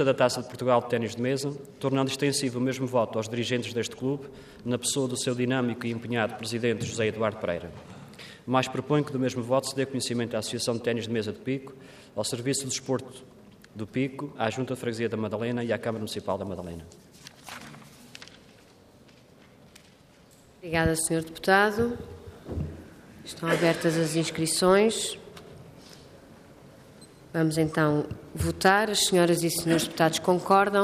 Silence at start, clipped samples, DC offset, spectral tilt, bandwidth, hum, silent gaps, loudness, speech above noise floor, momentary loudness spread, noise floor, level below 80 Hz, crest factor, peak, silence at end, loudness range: 0 s; under 0.1%; under 0.1%; -4.5 dB/octave; 15.5 kHz; none; none; -27 LUFS; 29 dB; 22 LU; -56 dBFS; -56 dBFS; 20 dB; -8 dBFS; 0 s; 8 LU